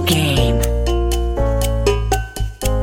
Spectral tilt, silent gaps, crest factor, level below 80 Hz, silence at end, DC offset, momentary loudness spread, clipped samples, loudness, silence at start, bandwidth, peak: -5 dB/octave; none; 14 dB; -20 dBFS; 0 s; under 0.1%; 6 LU; under 0.1%; -18 LUFS; 0 s; 17 kHz; -2 dBFS